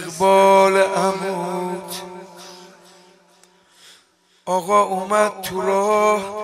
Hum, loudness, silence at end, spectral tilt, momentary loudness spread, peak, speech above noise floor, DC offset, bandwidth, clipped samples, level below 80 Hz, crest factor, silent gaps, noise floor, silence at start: none; -18 LUFS; 0 s; -4 dB/octave; 23 LU; -2 dBFS; 40 dB; under 0.1%; 16 kHz; under 0.1%; -64 dBFS; 18 dB; none; -58 dBFS; 0 s